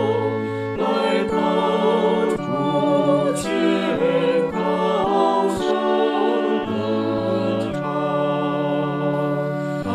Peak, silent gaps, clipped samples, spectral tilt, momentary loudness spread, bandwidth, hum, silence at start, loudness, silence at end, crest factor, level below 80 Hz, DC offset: -8 dBFS; none; under 0.1%; -6.5 dB/octave; 5 LU; 14 kHz; none; 0 s; -20 LUFS; 0 s; 12 dB; -54 dBFS; under 0.1%